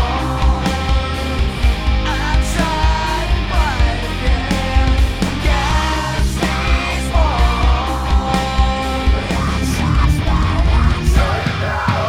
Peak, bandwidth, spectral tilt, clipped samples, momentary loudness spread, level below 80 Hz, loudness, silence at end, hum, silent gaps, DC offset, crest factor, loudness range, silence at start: 0 dBFS; 14.5 kHz; -5.5 dB/octave; under 0.1%; 3 LU; -18 dBFS; -17 LUFS; 0 s; none; none; under 0.1%; 14 dB; 1 LU; 0 s